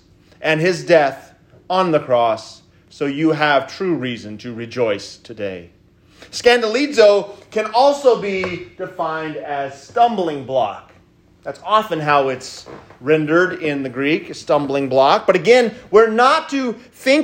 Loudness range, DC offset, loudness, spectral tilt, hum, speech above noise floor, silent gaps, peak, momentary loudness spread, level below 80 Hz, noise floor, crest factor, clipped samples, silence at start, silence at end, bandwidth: 6 LU; under 0.1%; -17 LUFS; -5 dB/octave; none; 34 dB; none; 0 dBFS; 15 LU; -58 dBFS; -51 dBFS; 18 dB; under 0.1%; 0.4 s; 0 s; 16 kHz